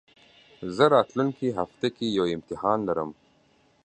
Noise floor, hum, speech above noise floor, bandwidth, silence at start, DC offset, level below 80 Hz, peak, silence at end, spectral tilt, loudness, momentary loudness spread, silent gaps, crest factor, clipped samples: -63 dBFS; none; 38 dB; 9 kHz; 0.6 s; under 0.1%; -62 dBFS; -4 dBFS; 0.7 s; -6.5 dB/octave; -26 LUFS; 12 LU; none; 22 dB; under 0.1%